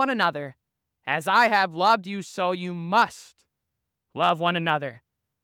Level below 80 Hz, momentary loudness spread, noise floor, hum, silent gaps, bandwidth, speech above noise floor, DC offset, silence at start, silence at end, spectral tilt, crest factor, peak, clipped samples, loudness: -76 dBFS; 17 LU; -82 dBFS; none; none; 19 kHz; 58 dB; under 0.1%; 0 s; 0.45 s; -4.5 dB/octave; 18 dB; -8 dBFS; under 0.1%; -23 LUFS